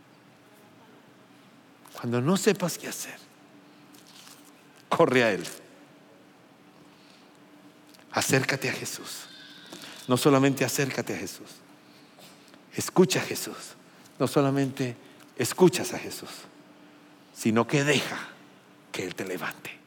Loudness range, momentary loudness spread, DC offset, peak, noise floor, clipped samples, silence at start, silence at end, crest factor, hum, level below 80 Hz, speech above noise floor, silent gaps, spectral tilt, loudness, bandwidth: 4 LU; 22 LU; under 0.1%; -8 dBFS; -55 dBFS; under 0.1%; 1.9 s; 0.1 s; 22 dB; none; -82 dBFS; 29 dB; none; -4.5 dB/octave; -27 LUFS; 17 kHz